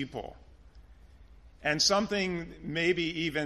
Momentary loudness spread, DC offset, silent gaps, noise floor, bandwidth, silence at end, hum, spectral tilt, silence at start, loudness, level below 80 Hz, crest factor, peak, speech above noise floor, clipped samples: 14 LU; under 0.1%; none; -54 dBFS; 13 kHz; 0 s; none; -3 dB/octave; 0 s; -29 LUFS; -54 dBFS; 20 dB; -12 dBFS; 24 dB; under 0.1%